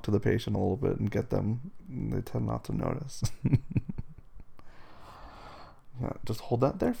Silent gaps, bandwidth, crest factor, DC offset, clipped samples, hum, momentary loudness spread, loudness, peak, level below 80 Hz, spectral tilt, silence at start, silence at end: none; 16.5 kHz; 20 dB; under 0.1%; under 0.1%; none; 21 LU; -32 LUFS; -12 dBFS; -46 dBFS; -7.5 dB/octave; 0 s; 0 s